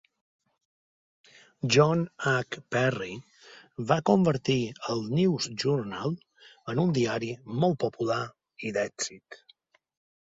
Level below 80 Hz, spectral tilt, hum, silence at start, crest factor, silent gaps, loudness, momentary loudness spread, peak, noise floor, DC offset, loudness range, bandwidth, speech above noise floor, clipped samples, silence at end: -64 dBFS; -5.5 dB/octave; none; 1.65 s; 22 dB; none; -28 LUFS; 15 LU; -8 dBFS; -63 dBFS; under 0.1%; 3 LU; 8 kHz; 36 dB; under 0.1%; 0.9 s